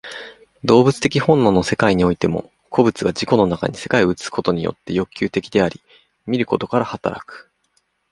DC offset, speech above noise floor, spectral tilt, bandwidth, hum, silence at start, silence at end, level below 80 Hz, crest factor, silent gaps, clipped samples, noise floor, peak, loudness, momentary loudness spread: under 0.1%; 48 dB; -6 dB/octave; 11.5 kHz; none; 0.05 s; 0.7 s; -46 dBFS; 18 dB; none; under 0.1%; -66 dBFS; 0 dBFS; -18 LUFS; 12 LU